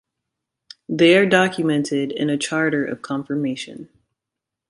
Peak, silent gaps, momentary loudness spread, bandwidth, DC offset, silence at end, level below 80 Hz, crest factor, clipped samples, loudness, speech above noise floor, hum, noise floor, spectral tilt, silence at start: -2 dBFS; none; 15 LU; 11.5 kHz; under 0.1%; 0.85 s; -64 dBFS; 20 dB; under 0.1%; -19 LUFS; 65 dB; none; -84 dBFS; -5 dB/octave; 0.9 s